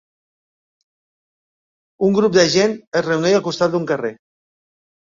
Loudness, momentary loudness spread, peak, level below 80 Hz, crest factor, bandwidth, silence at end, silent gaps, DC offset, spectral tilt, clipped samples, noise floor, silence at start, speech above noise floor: -17 LUFS; 9 LU; 0 dBFS; -60 dBFS; 20 dB; 7.6 kHz; 0.9 s; 2.87-2.91 s; under 0.1%; -4.5 dB/octave; under 0.1%; under -90 dBFS; 2 s; over 73 dB